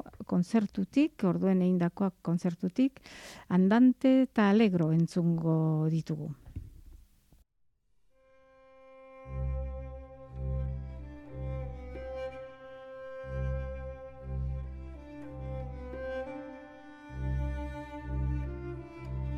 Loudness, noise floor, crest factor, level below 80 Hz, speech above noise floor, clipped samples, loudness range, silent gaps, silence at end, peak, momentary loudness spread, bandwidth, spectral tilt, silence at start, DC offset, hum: -31 LUFS; -74 dBFS; 18 dB; -44 dBFS; 47 dB; under 0.1%; 15 LU; none; 0 s; -14 dBFS; 21 LU; 11 kHz; -8.5 dB/octave; 0.05 s; under 0.1%; none